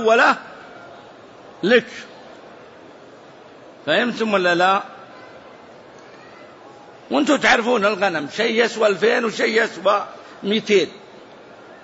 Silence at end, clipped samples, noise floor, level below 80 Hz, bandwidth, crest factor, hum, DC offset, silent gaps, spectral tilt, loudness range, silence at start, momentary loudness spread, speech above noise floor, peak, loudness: 0.1 s; under 0.1%; -43 dBFS; -64 dBFS; 8 kHz; 18 dB; none; under 0.1%; none; -4 dB/octave; 6 LU; 0 s; 23 LU; 25 dB; -4 dBFS; -18 LUFS